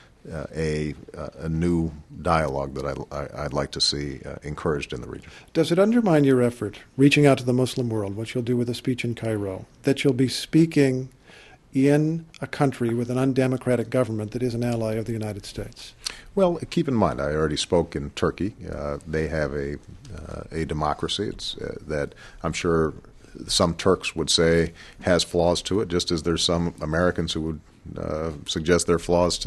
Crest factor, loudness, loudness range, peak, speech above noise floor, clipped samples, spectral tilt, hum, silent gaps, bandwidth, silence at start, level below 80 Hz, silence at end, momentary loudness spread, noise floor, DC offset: 22 dB; -24 LUFS; 6 LU; -4 dBFS; 26 dB; under 0.1%; -5.5 dB/octave; none; none; 12.5 kHz; 0.25 s; -44 dBFS; 0 s; 14 LU; -50 dBFS; under 0.1%